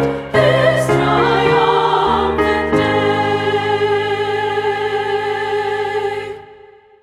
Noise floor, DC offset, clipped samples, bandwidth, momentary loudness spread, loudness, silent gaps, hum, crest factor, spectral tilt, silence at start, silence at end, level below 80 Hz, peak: -43 dBFS; under 0.1%; under 0.1%; 13.5 kHz; 6 LU; -15 LUFS; none; none; 14 dB; -6 dB/octave; 0 s; 0.5 s; -40 dBFS; -2 dBFS